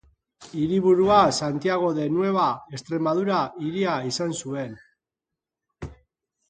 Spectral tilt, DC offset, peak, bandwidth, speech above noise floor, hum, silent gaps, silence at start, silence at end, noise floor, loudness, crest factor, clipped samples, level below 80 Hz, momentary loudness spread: -5.5 dB/octave; under 0.1%; -4 dBFS; 9.4 kHz; 64 dB; none; none; 0.4 s; 0.55 s; -87 dBFS; -23 LUFS; 20 dB; under 0.1%; -56 dBFS; 18 LU